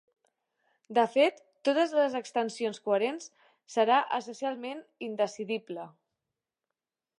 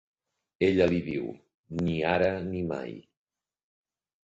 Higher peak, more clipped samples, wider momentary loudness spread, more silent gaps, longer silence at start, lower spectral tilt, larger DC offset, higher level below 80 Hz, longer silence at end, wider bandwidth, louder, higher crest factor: about the same, -12 dBFS vs -10 dBFS; neither; about the same, 15 LU vs 15 LU; second, none vs 1.54-1.64 s; first, 0.9 s vs 0.6 s; second, -4 dB/octave vs -7.5 dB/octave; neither; second, -88 dBFS vs -52 dBFS; about the same, 1.3 s vs 1.25 s; first, 11 kHz vs 7.8 kHz; about the same, -29 LUFS vs -28 LUFS; about the same, 20 dB vs 20 dB